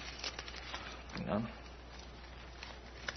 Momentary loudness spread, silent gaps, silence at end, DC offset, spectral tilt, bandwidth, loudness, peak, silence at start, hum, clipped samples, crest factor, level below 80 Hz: 13 LU; none; 0 s; under 0.1%; -3.5 dB/octave; 6.2 kHz; -44 LUFS; -20 dBFS; 0 s; none; under 0.1%; 24 dB; -54 dBFS